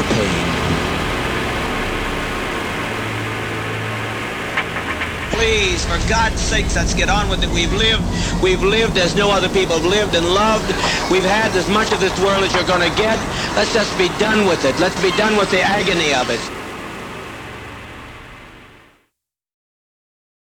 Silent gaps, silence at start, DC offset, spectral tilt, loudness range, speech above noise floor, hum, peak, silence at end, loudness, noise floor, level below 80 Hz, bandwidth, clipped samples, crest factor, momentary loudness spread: none; 0 s; under 0.1%; -4 dB/octave; 6 LU; 56 dB; none; -4 dBFS; 1.8 s; -17 LUFS; -72 dBFS; -30 dBFS; 19.5 kHz; under 0.1%; 14 dB; 11 LU